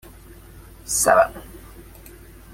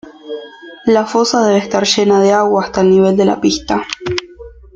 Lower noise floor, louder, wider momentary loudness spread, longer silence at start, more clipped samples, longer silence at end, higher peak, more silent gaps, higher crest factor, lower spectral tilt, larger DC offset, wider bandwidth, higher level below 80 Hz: first, -44 dBFS vs -36 dBFS; second, -18 LUFS vs -13 LUFS; first, 26 LU vs 17 LU; first, 0.55 s vs 0.05 s; neither; first, 0.7 s vs 0.25 s; about the same, -2 dBFS vs 0 dBFS; neither; first, 22 dB vs 14 dB; second, -2 dB/octave vs -4.5 dB/octave; neither; first, 16.5 kHz vs 8.8 kHz; about the same, -46 dBFS vs -44 dBFS